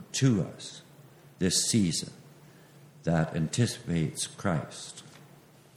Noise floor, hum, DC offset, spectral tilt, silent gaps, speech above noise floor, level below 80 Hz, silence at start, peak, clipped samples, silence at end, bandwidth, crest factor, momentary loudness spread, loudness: -56 dBFS; none; under 0.1%; -4.5 dB/octave; none; 27 dB; -62 dBFS; 0 s; -12 dBFS; under 0.1%; 0.5 s; 16 kHz; 18 dB; 18 LU; -29 LUFS